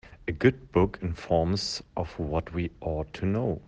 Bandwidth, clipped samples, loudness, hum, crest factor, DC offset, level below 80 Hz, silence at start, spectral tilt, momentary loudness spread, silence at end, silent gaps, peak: 9.6 kHz; under 0.1%; -29 LUFS; none; 20 dB; under 0.1%; -44 dBFS; 0.05 s; -6.5 dB/octave; 9 LU; 0.05 s; none; -8 dBFS